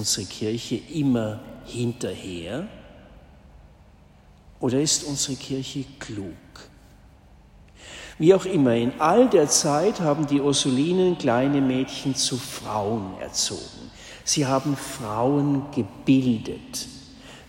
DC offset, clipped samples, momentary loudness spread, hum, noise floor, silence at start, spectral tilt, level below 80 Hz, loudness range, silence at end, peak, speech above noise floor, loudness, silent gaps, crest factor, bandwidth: under 0.1%; under 0.1%; 17 LU; none; -52 dBFS; 0 s; -4.5 dB/octave; -54 dBFS; 10 LU; 0.05 s; -4 dBFS; 29 dB; -23 LUFS; none; 20 dB; 16 kHz